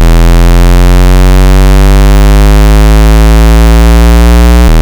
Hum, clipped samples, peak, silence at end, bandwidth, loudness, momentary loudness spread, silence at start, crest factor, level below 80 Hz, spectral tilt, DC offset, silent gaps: none; under 0.1%; 0 dBFS; 0 s; over 20 kHz; -5 LUFS; 1 LU; 0 s; 2 dB; -2 dBFS; -6 dB/octave; under 0.1%; none